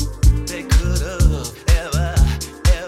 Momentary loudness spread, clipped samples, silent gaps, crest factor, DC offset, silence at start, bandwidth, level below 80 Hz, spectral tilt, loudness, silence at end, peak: 3 LU; under 0.1%; none; 14 dB; under 0.1%; 0 s; 15 kHz; -18 dBFS; -5 dB/octave; -19 LUFS; 0 s; -2 dBFS